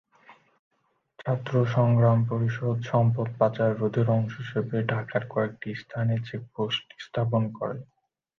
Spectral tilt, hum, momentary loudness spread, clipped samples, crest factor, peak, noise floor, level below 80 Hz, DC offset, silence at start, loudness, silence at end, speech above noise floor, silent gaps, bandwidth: -8.5 dB/octave; none; 12 LU; under 0.1%; 18 dB; -8 dBFS; -56 dBFS; -62 dBFS; under 0.1%; 0.3 s; -27 LUFS; 0.55 s; 31 dB; 0.59-0.71 s; 6.4 kHz